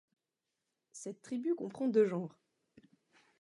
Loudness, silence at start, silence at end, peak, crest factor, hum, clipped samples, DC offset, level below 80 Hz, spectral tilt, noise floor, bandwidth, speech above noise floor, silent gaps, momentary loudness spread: -35 LUFS; 0.95 s; 1.1 s; -18 dBFS; 20 dB; none; under 0.1%; under 0.1%; -88 dBFS; -7 dB/octave; -89 dBFS; 11.5 kHz; 55 dB; none; 17 LU